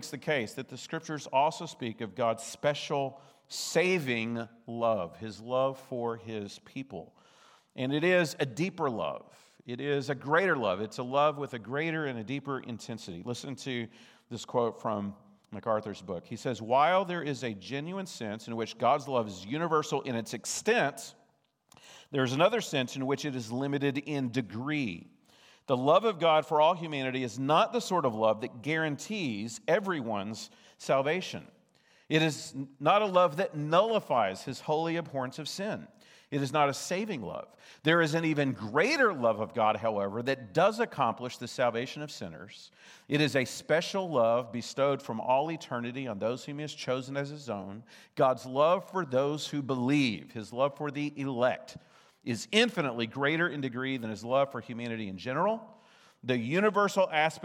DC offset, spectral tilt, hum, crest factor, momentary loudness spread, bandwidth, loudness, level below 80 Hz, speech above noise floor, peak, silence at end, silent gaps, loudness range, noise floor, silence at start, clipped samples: under 0.1%; -5 dB/octave; none; 22 dB; 14 LU; 16.5 kHz; -30 LUFS; -80 dBFS; 40 dB; -8 dBFS; 0 s; none; 5 LU; -71 dBFS; 0 s; under 0.1%